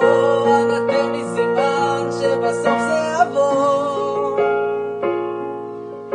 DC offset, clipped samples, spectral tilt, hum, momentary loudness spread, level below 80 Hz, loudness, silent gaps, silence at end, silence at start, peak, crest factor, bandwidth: under 0.1%; under 0.1%; -5 dB/octave; none; 9 LU; -62 dBFS; -18 LUFS; none; 0 s; 0 s; -2 dBFS; 16 dB; 10 kHz